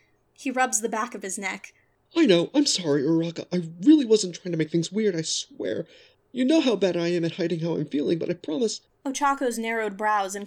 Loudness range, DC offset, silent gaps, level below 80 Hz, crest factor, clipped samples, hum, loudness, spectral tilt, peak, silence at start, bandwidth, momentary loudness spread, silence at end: 4 LU; under 0.1%; none; -70 dBFS; 18 dB; under 0.1%; none; -25 LUFS; -4.5 dB/octave; -6 dBFS; 0.4 s; 14 kHz; 11 LU; 0 s